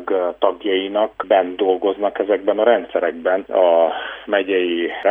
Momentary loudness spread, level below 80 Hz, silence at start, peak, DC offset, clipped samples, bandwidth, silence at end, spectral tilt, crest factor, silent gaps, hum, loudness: 6 LU; -60 dBFS; 0 s; -2 dBFS; under 0.1%; under 0.1%; 3.7 kHz; 0 s; -7 dB/octave; 16 dB; none; none; -18 LUFS